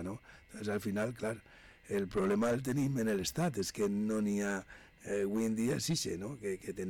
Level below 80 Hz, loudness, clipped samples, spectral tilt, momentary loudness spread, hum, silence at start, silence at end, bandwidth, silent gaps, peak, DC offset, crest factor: -62 dBFS; -35 LUFS; under 0.1%; -5 dB/octave; 10 LU; none; 0 s; 0 s; 18 kHz; none; -26 dBFS; under 0.1%; 10 dB